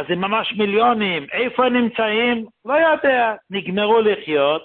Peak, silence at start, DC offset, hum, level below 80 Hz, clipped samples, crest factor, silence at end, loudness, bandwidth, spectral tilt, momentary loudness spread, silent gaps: -4 dBFS; 0 s; under 0.1%; none; -60 dBFS; under 0.1%; 14 dB; 0 s; -18 LUFS; 4.4 kHz; -10 dB/octave; 5 LU; none